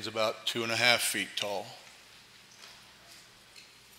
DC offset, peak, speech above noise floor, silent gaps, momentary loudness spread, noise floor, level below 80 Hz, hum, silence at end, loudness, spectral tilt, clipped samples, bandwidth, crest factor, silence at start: under 0.1%; -6 dBFS; 25 dB; none; 27 LU; -56 dBFS; -76 dBFS; none; 0.35 s; -29 LUFS; -1.5 dB/octave; under 0.1%; 16 kHz; 28 dB; 0 s